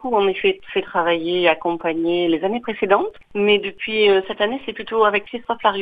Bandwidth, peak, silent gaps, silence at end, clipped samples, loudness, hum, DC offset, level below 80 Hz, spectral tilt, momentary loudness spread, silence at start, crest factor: 4.9 kHz; -2 dBFS; none; 0 s; under 0.1%; -19 LUFS; none; 0.4%; -56 dBFS; -7 dB/octave; 6 LU; 0 s; 18 dB